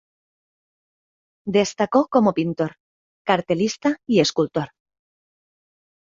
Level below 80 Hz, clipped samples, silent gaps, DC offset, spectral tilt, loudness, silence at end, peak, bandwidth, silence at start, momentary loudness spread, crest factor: -62 dBFS; under 0.1%; 2.80-3.25 s; under 0.1%; -5 dB/octave; -21 LUFS; 1.45 s; -2 dBFS; 7.8 kHz; 1.45 s; 10 LU; 20 dB